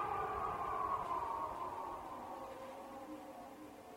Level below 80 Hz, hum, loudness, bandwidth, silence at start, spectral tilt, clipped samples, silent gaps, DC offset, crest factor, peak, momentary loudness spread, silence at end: -64 dBFS; none; -43 LUFS; 16.5 kHz; 0 s; -5.5 dB/octave; under 0.1%; none; under 0.1%; 18 dB; -26 dBFS; 13 LU; 0 s